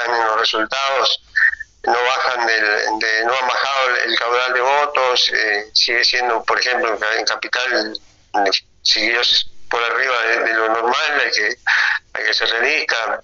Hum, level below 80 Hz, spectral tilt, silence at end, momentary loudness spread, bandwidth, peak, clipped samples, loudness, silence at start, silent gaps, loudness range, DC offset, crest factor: none; -56 dBFS; 3.5 dB/octave; 0.05 s; 5 LU; 7.6 kHz; -2 dBFS; under 0.1%; -16 LUFS; 0 s; none; 2 LU; under 0.1%; 16 dB